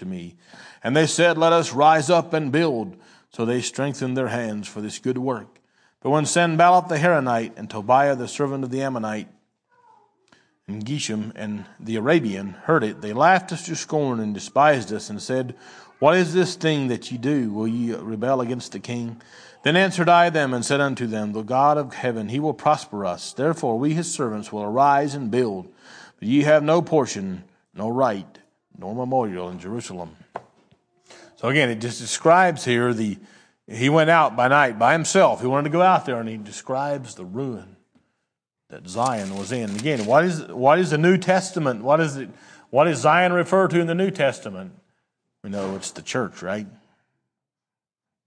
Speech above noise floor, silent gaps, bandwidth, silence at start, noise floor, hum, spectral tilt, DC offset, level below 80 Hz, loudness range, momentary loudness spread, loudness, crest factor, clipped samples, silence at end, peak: over 69 dB; none; 10.5 kHz; 0 s; under -90 dBFS; none; -5 dB/octave; under 0.1%; -70 dBFS; 9 LU; 15 LU; -21 LUFS; 20 dB; under 0.1%; 1.6 s; -2 dBFS